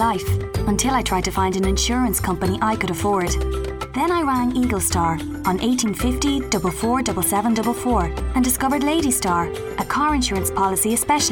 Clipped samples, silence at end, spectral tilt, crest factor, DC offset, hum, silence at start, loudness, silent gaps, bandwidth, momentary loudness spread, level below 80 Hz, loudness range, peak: under 0.1%; 0 s; -4 dB/octave; 14 dB; under 0.1%; none; 0 s; -20 LUFS; none; 19 kHz; 4 LU; -32 dBFS; 1 LU; -6 dBFS